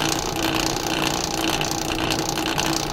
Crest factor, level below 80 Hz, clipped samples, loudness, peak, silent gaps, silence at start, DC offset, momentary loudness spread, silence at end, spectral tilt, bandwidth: 18 dB; -38 dBFS; under 0.1%; -22 LUFS; -4 dBFS; none; 0 s; under 0.1%; 1 LU; 0 s; -3 dB/octave; 16.5 kHz